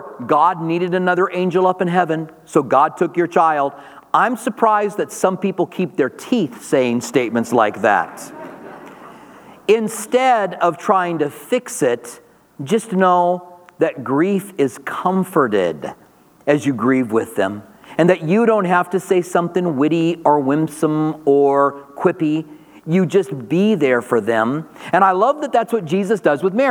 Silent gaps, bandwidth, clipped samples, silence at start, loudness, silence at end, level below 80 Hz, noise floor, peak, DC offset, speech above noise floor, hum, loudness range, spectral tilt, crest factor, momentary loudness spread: none; 19.5 kHz; under 0.1%; 0 s; -17 LUFS; 0 s; -68 dBFS; -42 dBFS; 0 dBFS; under 0.1%; 25 dB; none; 3 LU; -6 dB/octave; 16 dB; 8 LU